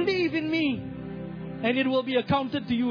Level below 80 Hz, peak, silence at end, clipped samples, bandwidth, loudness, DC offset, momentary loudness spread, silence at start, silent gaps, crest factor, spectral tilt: -56 dBFS; -12 dBFS; 0 s; under 0.1%; 5.4 kHz; -27 LUFS; under 0.1%; 12 LU; 0 s; none; 16 dB; -7.5 dB/octave